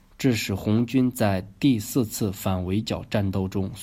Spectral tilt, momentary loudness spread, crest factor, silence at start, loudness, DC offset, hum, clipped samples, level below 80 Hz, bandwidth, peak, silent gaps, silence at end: -6 dB/octave; 5 LU; 16 dB; 0.2 s; -25 LUFS; under 0.1%; none; under 0.1%; -52 dBFS; 16 kHz; -8 dBFS; none; 0 s